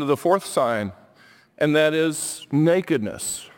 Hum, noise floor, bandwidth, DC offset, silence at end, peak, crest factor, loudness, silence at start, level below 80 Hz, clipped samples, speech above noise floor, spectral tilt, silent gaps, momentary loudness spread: none; -53 dBFS; 17 kHz; under 0.1%; 0.1 s; -6 dBFS; 18 dB; -22 LUFS; 0 s; -62 dBFS; under 0.1%; 32 dB; -4.5 dB/octave; none; 9 LU